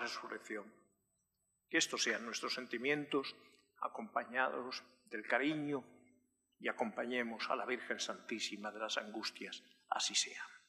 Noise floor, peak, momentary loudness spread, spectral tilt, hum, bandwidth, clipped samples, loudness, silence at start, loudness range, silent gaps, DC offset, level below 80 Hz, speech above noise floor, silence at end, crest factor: -84 dBFS; -20 dBFS; 12 LU; -2 dB/octave; none; 14.5 kHz; under 0.1%; -40 LUFS; 0 s; 2 LU; none; under 0.1%; under -90 dBFS; 43 dB; 0.1 s; 22 dB